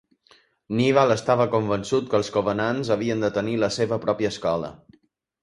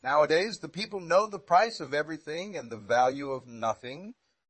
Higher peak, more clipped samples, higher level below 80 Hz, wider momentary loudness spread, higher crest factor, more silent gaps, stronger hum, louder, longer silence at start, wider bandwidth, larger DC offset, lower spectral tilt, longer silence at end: first, -4 dBFS vs -10 dBFS; neither; first, -56 dBFS vs -72 dBFS; second, 6 LU vs 14 LU; about the same, 20 dB vs 20 dB; neither; neither; first, -23 LUFS vs -29 LUFS; first, 0.7 s vs 0.05 s; first, 11.5 kHz vs 8.8 kHz; neither; first, -6 dB/octave vs -4 dB/octave; first, 0.65 s vs 0.4 s